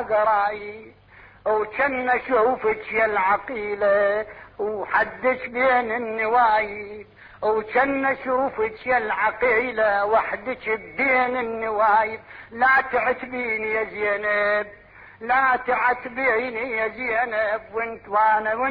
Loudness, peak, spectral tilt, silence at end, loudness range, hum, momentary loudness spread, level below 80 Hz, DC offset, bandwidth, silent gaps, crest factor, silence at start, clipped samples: -22 LUFS; -8 dBFS; -7.5 dB/octave; 0 s; 1 LU; none; 9 LU; -56 dBFS; under 0.1%; 5.2 kHz; none; 14 dB; 0 s; under 0.1%